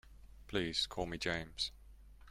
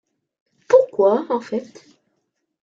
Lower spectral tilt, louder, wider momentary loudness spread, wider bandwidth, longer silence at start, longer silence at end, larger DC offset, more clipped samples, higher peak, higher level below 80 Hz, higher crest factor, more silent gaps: second, -3.5 dB/octave vs -6 dB/octave; second, -38 LUFS vs -19 LUFS; second, 5 LU vs 13 LU; first, 16 kHz vs 7.6 kHz; second, 0.05 s vs 0.7 s; second, 0 s vs 1 s; neither; neither; second, -22 dBFS vs -2 dBFS; first, -56 dBFS vs -70 dBFS; about the same, 20 dB vs 20 dB; neither